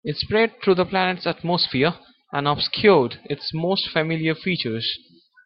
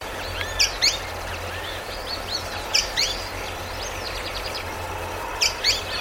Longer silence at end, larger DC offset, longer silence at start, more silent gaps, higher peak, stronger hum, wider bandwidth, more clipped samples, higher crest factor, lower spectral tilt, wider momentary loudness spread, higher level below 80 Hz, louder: first, 0.5 s vs 0 s; neither; about the same, 0.05 s vs 0 s; neither; about the same, -4 dBFS vs -6 dBFS; neither; second, 5.8 kHz vs 17 kHz; neither; about the same, 18 dB vs 22 dB; first, -9.5 dB/octave vs -1 dB/octave; about the same, 9 LU vs 11 LU; second, -56 dBFS vs -40 dBFS; first, -21 LUFS vs -24 LUFS